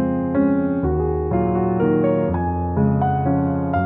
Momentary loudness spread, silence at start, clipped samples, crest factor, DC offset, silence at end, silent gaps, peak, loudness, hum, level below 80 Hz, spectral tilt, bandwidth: 3 LU; 0 s; under 0.1%; 12 dB; under 0.1%; 0 s; none; -6 dBFS; -20 LUFS; none; -34 dBFS; -13.5 dB/octave; 3.6 kHz